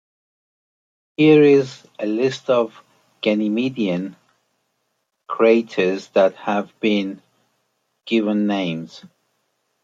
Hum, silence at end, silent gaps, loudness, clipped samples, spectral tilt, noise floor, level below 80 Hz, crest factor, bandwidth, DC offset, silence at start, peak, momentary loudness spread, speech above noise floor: none; 0.8 s; none; -19 LUFS; under 0.1%; -6.5 dB/octave; -73 dBFS; -72 dBFS; 18 dB; 7.6 kHz; under 0.1%; 1.2 s; -2 dBFS; 16 LU; 55 dB